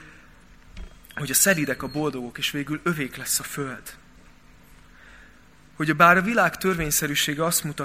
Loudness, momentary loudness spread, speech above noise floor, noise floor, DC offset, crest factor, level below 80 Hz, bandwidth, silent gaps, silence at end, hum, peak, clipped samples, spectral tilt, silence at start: -22 LUFS; 15 LU; 30 dB; -53 dBFS; 0.2%; 24 dB; -50 dBFS; 16 kHz; none; 0 s; none; -2 dBFS; under 0.1%; -3 dB/octave; 0 s